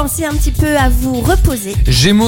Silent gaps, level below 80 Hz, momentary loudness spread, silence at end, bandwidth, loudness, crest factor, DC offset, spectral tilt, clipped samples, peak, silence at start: none; -16 dBFS; 5 LU; 0 s; 17 kHz; -13 LUFS; 12 dB; under 0.1%; -5 dB/octave; under 0.1%; 0 dBFS; 0 s